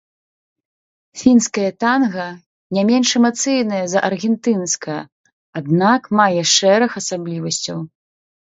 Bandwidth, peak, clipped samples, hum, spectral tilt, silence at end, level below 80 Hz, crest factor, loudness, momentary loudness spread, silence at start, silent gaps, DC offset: 8 kHz; 0 dBFS; under 0.1%; none; -4 dB/octave; 0.7 s; -62 dBFS; 18 dB; -16 LUFS; 14 LU; 1.15 s; 2.46-2.70 s, 5.12-5.24 s, 5.33-5.53 s; under 0.1%